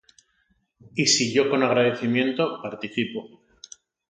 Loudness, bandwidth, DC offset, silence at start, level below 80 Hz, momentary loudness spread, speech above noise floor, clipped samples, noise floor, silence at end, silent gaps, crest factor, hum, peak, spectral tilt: -23 LUFS; 9.6 kHz; under 0.1%; 0.95 s; -70 dBFS; 12 LU; 46 dB; under 0.1%; -69 dBFS; 0.8 s; none; 18 dB; none; -6 dBFS; -3.5 dB/octave